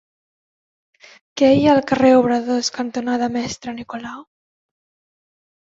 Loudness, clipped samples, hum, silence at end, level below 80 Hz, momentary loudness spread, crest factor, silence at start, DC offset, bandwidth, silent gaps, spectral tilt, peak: -17 LUFS; under 0.1%; none; 1.55 s; -54 dBFS; 17 LU; 18 dB; 1.35 s; under 0.1%; 7.8 kHz; none; -5 dB/octave; -2 dBFS